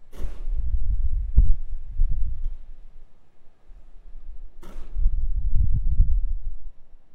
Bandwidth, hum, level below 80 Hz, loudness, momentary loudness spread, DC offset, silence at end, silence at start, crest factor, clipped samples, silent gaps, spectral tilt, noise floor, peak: 0.9 kHz; none; -24 dBFS; -29 LUFS; 22 LU; under 0.1%; 0 s; 0 s; 16 dB; under 0.1%; none; -9 dB/octave; -41 dBFS; -4 dBFS